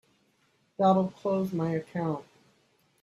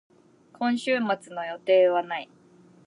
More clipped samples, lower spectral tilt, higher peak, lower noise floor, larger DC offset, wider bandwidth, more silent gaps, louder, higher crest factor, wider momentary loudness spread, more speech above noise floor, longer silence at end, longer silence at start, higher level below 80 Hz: neither; first, -8.5 dB/octave vs -5 dB/octave; about the same, -12 dBFS vs -10 dBFS; first, -70 dBFS vs -56 dBFS; neither; first, 12.5 kHz vs 11 kHz; neither; second, -29 LUFS vs -25 LUFS; about the same, 18 dB vs 16 dB; second, 11 LU vs 14 LU; first, 42 dB vs 32 dB; first, 0.8 s vs 0.65 s; first, 0.8 s vs 0.6 s; first, -70 dBFS vs -82 dBFS